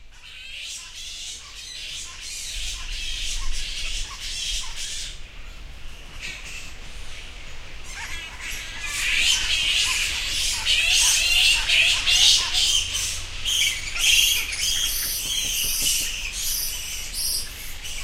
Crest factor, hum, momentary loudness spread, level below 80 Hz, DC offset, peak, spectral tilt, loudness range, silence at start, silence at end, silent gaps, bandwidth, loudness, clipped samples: 20 dB; none; 22 LU; -36 dBFS; under 0.1%; -4 dBFS; 1.5 dB/octave; 16 LU; 0 s; 0 s; none; 16 kHz; -21 LUFS; under 0.1%